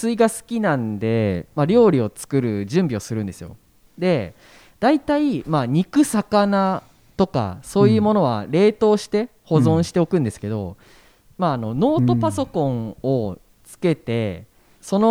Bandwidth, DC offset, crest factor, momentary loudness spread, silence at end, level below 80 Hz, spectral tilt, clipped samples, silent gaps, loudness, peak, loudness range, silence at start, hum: 16 kHz; under 0.1%; 18 dB; 11 LU; 0 s; -52 dBFS; -7 dB/octave; under 0.1%; none; -20 LUFS; -2 dBFS; 4 LU; 0 s; none